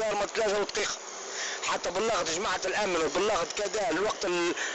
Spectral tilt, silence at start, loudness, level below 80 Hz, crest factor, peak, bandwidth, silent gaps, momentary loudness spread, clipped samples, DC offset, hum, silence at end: -2 dB/octave; 0 s; -29 LUFS; -58 dBFS; 8 dB; -22 dBFS; 8.4 kHz; none; 4 LU; under 0.1%; under 0.1%; none; 0 s